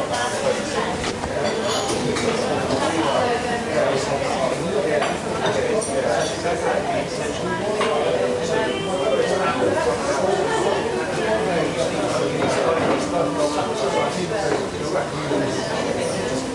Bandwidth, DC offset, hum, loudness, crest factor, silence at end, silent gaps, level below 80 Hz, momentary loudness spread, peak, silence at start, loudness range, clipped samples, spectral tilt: 11.5 kHz; under 0.1%; none; -22 LUFS; 14 dB; 0 s; none; -48 dBFS; 3 LU; -8 dBFS; 0 s; 1 LU; under 0.1%; -4 dB/octave